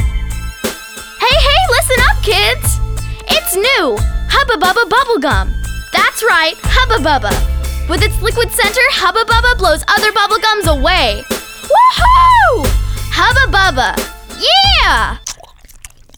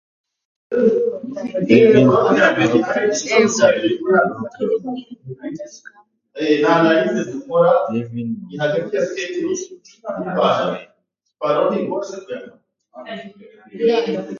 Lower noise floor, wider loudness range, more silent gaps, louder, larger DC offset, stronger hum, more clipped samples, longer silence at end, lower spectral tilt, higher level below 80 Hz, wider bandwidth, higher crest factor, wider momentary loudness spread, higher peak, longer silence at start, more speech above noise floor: second, -38 dBFS vs -49 dBFS; second, 3 LU vs 8 LU; neither; first, -11 LUFS vs -17 LUFS; neither; neither; neither; first, 0.3 s vs 0 s; second, -3 dB/octave vs -5 dB/octave; first, -20 dBFS vs -60 dBFS; first, over 20 kHz vs 7.4 kHz; second, 12 dB vs 18 dB; second, 13 LU vs 19 LU; about the same, 0 dBFS vs 0 dBFS; second, 0 s vs 0.7 s; second, 27 dB vs 31 dB